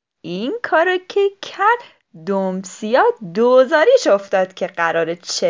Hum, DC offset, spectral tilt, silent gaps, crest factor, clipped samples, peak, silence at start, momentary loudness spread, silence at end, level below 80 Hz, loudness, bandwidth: none; under 0.1%; -4 dB/octave; none; 16 dB; under 0.1%; -2 dBFS; 0.25 s; 11 LU; 0 s; -76 dBFS; -17 LUFS; 7.6 kHz